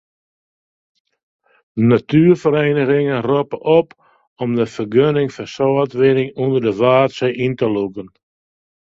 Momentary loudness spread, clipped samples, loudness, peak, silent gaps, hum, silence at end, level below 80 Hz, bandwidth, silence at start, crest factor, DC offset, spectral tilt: 9 LU; under 0.1%; -16 LUFS; 0 dBFS; 4.27-4.36 s; none; 0.75 s; -56 dBFS; 7.8 kHz; 1.75 s; 16 dB; under 0.1%; -8 dB/octave